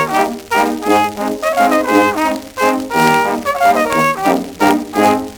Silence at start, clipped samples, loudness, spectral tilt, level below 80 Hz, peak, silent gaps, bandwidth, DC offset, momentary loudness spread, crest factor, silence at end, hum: 0 s; under 0.1%; -14 LUFS; -4 dB/octave; -48 dBFS; 0 dBFS; none; over 20 kHz; under 0.1%; 5 LU; 14 dB; 0 s; none